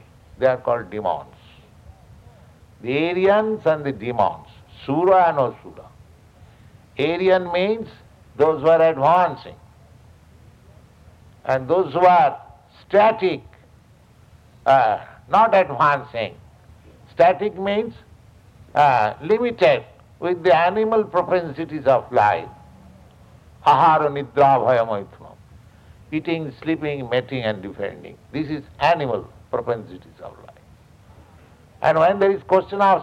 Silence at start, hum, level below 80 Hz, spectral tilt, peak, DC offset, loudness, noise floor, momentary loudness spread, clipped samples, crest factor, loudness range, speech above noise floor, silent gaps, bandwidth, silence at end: 0.4 s; none; -54 dBFS; -7 dB/octave; -2 dBFS; under 0.1%; -19 LUFS; -51 dBFS; 15 LU; under 0.1%; 18 dB; 6 LU; 32 dB; none; 9 kHz; 0 s